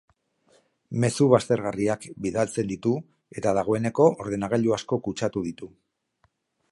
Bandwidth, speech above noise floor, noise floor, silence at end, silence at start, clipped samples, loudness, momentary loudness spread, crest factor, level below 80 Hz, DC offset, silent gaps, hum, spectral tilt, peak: 11.5 kHz; 45 dB; -69 dBFS; 1.05 s; 0.9 s; under 0.1%; -25 LUFS; 11 LU; 22 dB; -58 dBFS; under 0.1%; none; none; -6.5 dB/octave; -2 dBFS